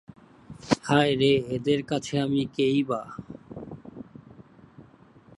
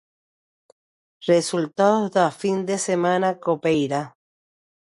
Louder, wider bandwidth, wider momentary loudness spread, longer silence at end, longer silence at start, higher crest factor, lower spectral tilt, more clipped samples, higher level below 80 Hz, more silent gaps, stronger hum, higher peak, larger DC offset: second, -25 LUFS vs -22 LUFS; about the same, 11.5 kHz vs 11.5 kHz; first, 21 LU vs 6 LU; second, 0.55 s vs 0.85 s; second, 0.5 s vs 1.2 s; about the same, 22 dB vs 18 dB; about the same, -6 dB/octave vs -5 dB/octave; neither; first, -58 dBFS vs -66 dBFS; neither; neither; about the same, -6 dBFS vs -6 dBFS; neither